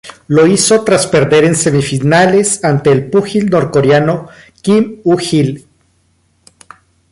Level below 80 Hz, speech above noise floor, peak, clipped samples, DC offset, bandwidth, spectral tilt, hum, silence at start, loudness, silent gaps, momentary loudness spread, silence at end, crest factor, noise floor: -46 dBFS; 46 dB; 0 dBFS; under 0.1%; under 0.1%; 11.5 kHz; -5 dB/octave; none; 0.05 s; -11 LUFS; none; 6 LU; 1.5 s; 12 dB; -56 dBFS